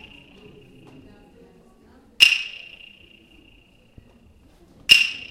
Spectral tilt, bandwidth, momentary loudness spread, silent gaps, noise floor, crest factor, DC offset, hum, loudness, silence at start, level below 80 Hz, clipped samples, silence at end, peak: 1 dB/octave; 16 kHz; 23 LU; none; -54 dBFS; 26 dB; under 0.1%; none; -15 LUFS; 2.2 s; -56 dBFS; under 0.1%; 0.05 s; 0 dBFS